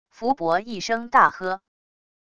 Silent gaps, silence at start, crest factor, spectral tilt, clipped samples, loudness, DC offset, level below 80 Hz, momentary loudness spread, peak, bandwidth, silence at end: none; 0.15 s; 22 dB; -4 dB/octave; under 0.1%; -22 LUFS; 0.5%; -62 dBFS; 12 LU; -2 dBFS; 11 kHz; 0.75 s